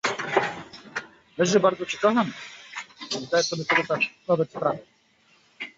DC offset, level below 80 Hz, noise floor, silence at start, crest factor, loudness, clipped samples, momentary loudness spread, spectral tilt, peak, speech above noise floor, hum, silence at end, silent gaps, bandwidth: under 0.1%; -68 dBFS; -61 dBFS; 0.05 s; 20 dB; -25 LUFS; under 0.1%; 16 LU; -4 dB/octave; -6 dBFS; 38 dB; none; 0.1 s; none; 8 kHz